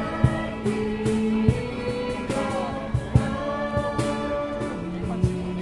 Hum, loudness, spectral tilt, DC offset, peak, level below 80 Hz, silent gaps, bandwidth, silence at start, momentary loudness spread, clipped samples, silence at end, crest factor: none; -26 LUFS; -7 dB/octave; under 0.1%; -4 dBFS; -38 dBFS; none; 11.5 kHz; 0 s; 6 LU; under 0.1%; 0 s; 20 dB